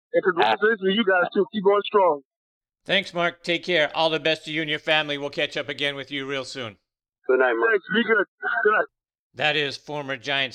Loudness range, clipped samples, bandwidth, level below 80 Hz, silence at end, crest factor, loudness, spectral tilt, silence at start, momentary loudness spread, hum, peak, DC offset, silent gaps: 3 LU; under 0.1%; 9.8 kHz; -68 dBFS; 0 s; 18 dB; -23 LUFS; -4.5 dB/octave; 0.15 s; 10 LU; none; -6 dBFS; under 0.1%; 2.25-2.61 s, 8.28-8.38 s, 9.19-9.30 s